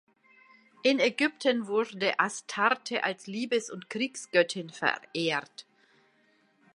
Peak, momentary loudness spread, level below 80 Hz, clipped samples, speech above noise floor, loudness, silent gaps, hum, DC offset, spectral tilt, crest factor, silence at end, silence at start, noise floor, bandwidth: -8 dBFS; 7 LU; -84 dBFS; under 0.1%; 38 dB; -29 LUFS; none; none; under 0.1%; -3.5 dB/octave; 22 dB; 1.15 s; 0.85 s; -67 dBFS; 11.5 kHz